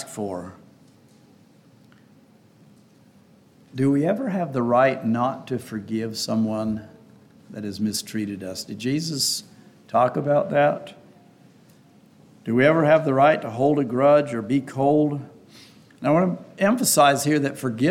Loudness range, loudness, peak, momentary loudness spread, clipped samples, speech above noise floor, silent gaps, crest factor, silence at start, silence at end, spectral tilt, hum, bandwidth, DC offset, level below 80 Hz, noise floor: 8 LU; -22 LUFS; -4 dBFS; 15 LU; under 0.1%; 33 dB; none; 18 dB; 0 s; 0 s; -5 dB/octave; none; 17 kHz; under 0.1%; -66 dBFS; -54 dBFS